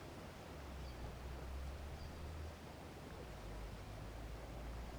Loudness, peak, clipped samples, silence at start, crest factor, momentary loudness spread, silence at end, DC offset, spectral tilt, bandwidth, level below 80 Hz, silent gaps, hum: -52 LUFS; -36 dBFS; under 0.1%; 0 s; 12 dB; 3 LU; 0 s; under 0.1%; -5.5 dB/octave; over 20 kHz; -52 dBFS; none; none